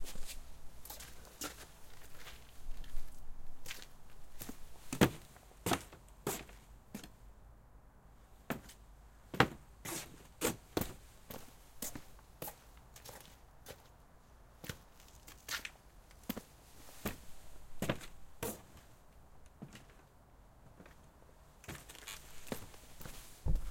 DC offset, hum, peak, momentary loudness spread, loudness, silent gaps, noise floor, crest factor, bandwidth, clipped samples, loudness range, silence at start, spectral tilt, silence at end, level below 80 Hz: under 0.1%; none; -8 dBFS; 24 LU; -43 LUFS; none; -61 dBFS; 34 dB; 16.5 kHz; under 0.1%; 13 LU; 0 s; -4 dB/octave; 0 s; -50 dBFS